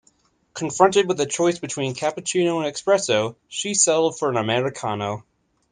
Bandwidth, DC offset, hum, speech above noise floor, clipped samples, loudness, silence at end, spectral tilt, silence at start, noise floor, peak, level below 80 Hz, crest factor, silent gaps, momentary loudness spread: 10 kHz; under 0.1%; none; 41 dB; under 0.1%; -21 LUFS; 0.5 s; -3.5 dB/octave; 0.55 s; -62 dBFS; 0 dBFS; -64 dBFS; 22 dB; none; 11 LU